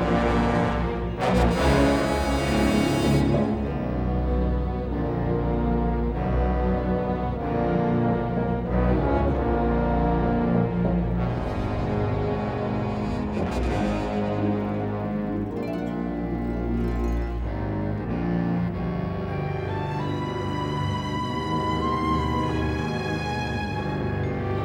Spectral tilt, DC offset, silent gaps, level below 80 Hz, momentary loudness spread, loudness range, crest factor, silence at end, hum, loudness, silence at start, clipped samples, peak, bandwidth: -7.5 dB/octave; under 0.1%; none; -32 dBFS; 7 LU; 5 LU; 16 dB; 0 s; none; -25 LUFS; 0 s; under 0.1%; -8 dBFS; 18 kHz